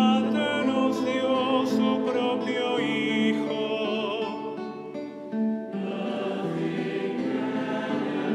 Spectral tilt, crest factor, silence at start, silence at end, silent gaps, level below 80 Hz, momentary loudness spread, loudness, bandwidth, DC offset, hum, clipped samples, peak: -6 dB/octave; 16 dB; 0 s; 0 s; none; -78 dBFS; 8 LU; -27 LUFS; 12 kHz; under 0.1%; none; under 0.1%; -10 dBFS